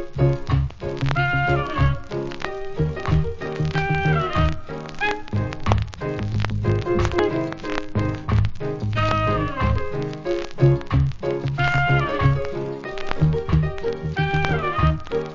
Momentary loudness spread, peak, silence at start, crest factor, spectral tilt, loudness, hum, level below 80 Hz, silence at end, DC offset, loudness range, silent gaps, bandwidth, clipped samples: 8 LU; -2 dBFS; 0 s; 20 dB; -7.5 dB/octave; -23 LUFS; none; -32 dBFS; 0 s; under 0.1%; 2 LU; none; 7.6 kHz; under 0.1%